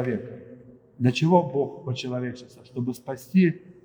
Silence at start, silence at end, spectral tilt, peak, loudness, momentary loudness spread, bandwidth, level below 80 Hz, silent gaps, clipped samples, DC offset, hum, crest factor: 0 s; 0.15 s; -7.5 dB/octave; -4 dBFS; -25 LUFS; 17 LU; over 20 kHz; -68 dBFS; none; under 0.1%; under 0.1%; none; 22 dB